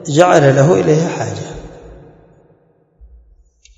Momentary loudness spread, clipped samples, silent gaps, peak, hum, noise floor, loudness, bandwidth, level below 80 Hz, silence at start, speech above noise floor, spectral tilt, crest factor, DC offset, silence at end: 19 LU; 0.2%; none; 0 dBFS; none; -53 dBFS; -12 LUFS; 8.8 kHz; -44 dBFS; 0 s; 42 dB; -6 dB/octave; 16 dB; under 0.1%; 1.85 s